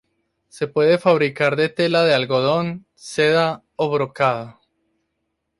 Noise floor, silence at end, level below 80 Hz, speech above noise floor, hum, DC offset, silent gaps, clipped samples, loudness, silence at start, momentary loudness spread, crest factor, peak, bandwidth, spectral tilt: -75 dBFS; 1.1 s; -62 dBFS; 56 dB; none; under 0.1%; none; under 0.1%; -19 LUFS; 0.55 s; 12 LU; 18 dB; -4 dBFS; 11.5 kHz; -5.5 dB/octave